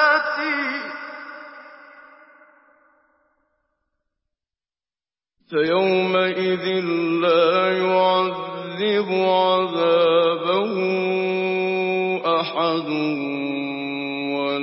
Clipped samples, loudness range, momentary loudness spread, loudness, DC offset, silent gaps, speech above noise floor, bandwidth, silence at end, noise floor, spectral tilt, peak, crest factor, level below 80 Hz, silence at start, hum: under 0.1%; 10 LU; 9 LU; -20 LUFS; under 0.1%; none; over 71 dB; 5.8 kHz; 0 s; under -90 dBFS; -9.5 dB/octave; -6 dBFS; 16 dB; -72 dBFS; 0 s; none